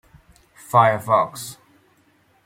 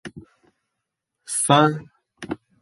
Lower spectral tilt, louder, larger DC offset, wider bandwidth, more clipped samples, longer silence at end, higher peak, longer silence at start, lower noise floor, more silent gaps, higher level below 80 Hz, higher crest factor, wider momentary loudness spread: about the same, -5 dB/octave vs -4 dB/octave; about the same, -19 LUFS vs -19 LUFS; neither; first, 16.5 kHz vs 12 kHz; neither; first, 0.95 s vs 0.25 s; about the same, -2 dBFS vs -2 dBFS; first, 0.75 s vs 0.05 s; second, -60 dBFS vs -81 dBFS; neither; about the same, -62 dBFS vs -62 dBFS; about the same, 20 dB vs 22 dB; second, 18 LU vs 23 LU